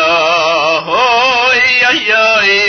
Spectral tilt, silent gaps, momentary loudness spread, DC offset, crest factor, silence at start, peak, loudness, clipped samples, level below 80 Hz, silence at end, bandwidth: -1.5 dB/octave; none; 3 LU; under 0.1%; 10 dB; 0 s; 0 dBFS; -9 LUFS; under 0.1%; -50 dBFS; 0 s; 6.6 kHz